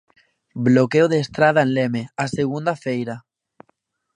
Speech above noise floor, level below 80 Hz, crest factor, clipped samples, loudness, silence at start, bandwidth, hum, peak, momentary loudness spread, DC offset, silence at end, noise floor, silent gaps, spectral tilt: 49 dB; -60 dBFS; 18 dB; under 0.1%; -19 LUFS; 0.55 s; 10 kHz; none; -2 dBFS; 11 LU; under 0.1%; 0.95 s; -68 dBFS; none; -6.5 dB/octave